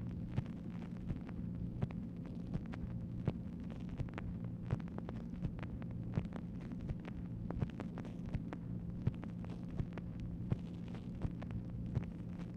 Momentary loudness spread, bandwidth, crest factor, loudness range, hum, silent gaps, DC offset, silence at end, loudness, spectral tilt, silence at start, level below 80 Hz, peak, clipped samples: 4 LU; 7 kHz; 20 dB; 0 LU; none; none; under 0.1%; 0 s; -44 LUFS; -9.5 dB/octave; 0 s; -52 dBFS; -22 dBFS; under 0.1%